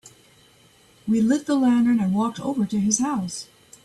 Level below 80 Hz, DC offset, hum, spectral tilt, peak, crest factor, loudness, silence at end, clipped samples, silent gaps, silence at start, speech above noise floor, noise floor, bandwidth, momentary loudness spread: -62 dBFS; under 0.1%; none; -5 dB/octave; -6 dBFS; 16 dB; -22 LUFS; 0.4 s; under 0.1%; none; 0.05 s; 34 dB; -55 dBFS; 12 kHz; 14 LU